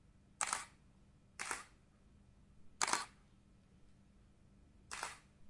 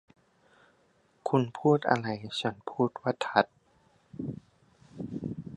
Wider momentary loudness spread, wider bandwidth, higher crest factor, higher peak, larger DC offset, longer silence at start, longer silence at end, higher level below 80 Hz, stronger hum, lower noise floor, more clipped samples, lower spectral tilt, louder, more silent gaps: first, 17 LU vs 14 LU; about the same, 11.5 kHz vs 11 kHz; first, 32 dB vs 26 dB; second, -16 dBFS vs -6 dBFS; neither; second, 0.15 s vs 1.25 s; about the same, 0 s vs 0 s; about the same, -70 dBFS vs -66 dBFS; neither; about the same, -67 dBFS vs -67 dBFS; neither; second, 0 dB/octave vs -6.5 dB/octave; second, -42 LUFS vs -30 LUFS; neither